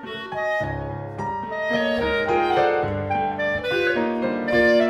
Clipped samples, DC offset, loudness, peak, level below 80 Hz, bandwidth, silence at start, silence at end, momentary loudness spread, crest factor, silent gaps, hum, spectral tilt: under 0.1%; under 0.1%; -23 LUFS; -6 dBFS; -46 dBFS; 14 kHz; 0 s; 0 s; 9 LU; 16 dB; none; none; -6.5 dB/octave